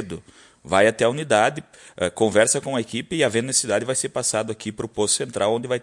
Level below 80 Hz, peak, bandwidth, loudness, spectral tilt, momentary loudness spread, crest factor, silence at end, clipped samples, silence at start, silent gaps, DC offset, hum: -60 dBFS; -4 dBFS; 11.5 kHz; -21 LUFS; -3 dB/octave; 11 LU; 20 dB; 0 s; under 0.1%; 0 s; none; under 0.1%; none